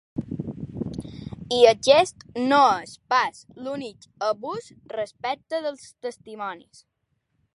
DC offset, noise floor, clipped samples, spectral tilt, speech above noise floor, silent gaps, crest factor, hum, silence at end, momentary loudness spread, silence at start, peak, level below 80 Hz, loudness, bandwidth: under 0.1%; -74 dBFS; under 0.1%; -4 dB/octave; 51 dB; none; 24 dB; none; 1 s; 18 LU; 0.15 s; -2 dBFS; -56 dBFS; -24 LUFS; 11.5 kHz